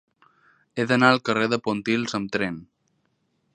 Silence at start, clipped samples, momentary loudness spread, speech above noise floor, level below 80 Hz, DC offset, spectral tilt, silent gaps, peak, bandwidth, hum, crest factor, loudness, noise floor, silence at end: 0.75 s; under 0.1%; 12 LU; 48 dB; -64 dBFS; under 0.1%; -5 dB/octave; none; 0 dBFS; 9.8 kHz; none; 24 dB; -23 LUFS; -71 dBFS; 0.9 s